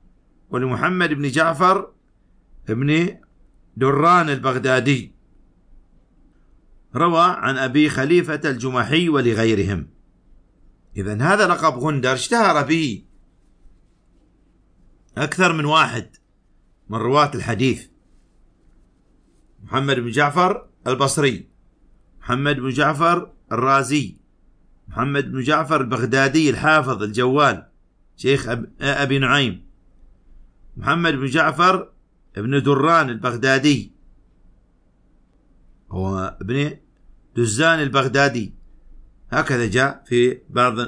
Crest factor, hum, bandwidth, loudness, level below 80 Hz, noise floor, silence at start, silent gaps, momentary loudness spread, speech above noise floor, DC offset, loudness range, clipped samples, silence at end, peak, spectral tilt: 18 dB; none; 10.5 kHz; -19 LUFS; -48 dBFS; -57 dBFS; 0.5 s; none; 12 LU; 39 dB; under 0.1%; 5 LU; under 0.1%; 0 s; -2 dBFS; -5 dB/octave